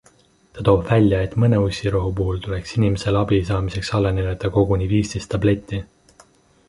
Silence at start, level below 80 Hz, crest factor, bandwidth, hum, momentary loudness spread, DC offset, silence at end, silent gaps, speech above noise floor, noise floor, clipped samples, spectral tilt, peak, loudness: 0.55 s; -34 dBFS; 18 dB; 11.5 kHz; none; 7 LU; under 0.1%; 0.85 s; none; 36 dB; -55 dBFS; under 0.1%; -7.5 dB/octave; -2 dBFS; -20 LUFS